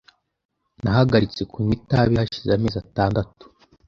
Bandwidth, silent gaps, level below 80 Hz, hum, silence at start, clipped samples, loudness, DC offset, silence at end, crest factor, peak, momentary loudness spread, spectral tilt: 7.2 kHz; none; -42 dBFS; none; 0.85 s; under 0.1%; -21 LUFS; under 0.1%; 0.65 s; 20 dB; -2 dBFS; 9 LU; -8 dB/octave